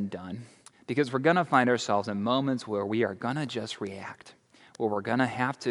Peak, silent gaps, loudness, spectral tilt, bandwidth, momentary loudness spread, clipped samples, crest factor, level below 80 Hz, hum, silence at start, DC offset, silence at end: -8 dBFS; none; -28 LUFS; -5.5 dB/octave; 11.5 kHz; 17 LU; under 0.1%; 22 dB; -74 dBFS; none; 0 s; under 0.1%; 0 s